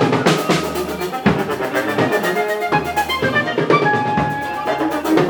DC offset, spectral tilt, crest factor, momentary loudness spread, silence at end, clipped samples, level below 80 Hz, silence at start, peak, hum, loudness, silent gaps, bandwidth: under 0.1%; -5 dB/octave; 16 dB; 6 LU; 0 s; under 0.1%; -44 dBFS; 0 s; 0 dBFS; none; -18 LUFS; none; over 20 kHz